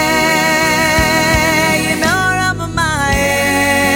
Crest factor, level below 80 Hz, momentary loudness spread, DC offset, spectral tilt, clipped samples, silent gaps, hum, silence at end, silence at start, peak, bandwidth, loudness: 12 dB; -30 dBFS; 4 LU; under 0.1%; -3.5 dB/octave; under 0.1%; none; none; 0 s; 0 s; 0 dBFS; 17 kHz; -12 LUFS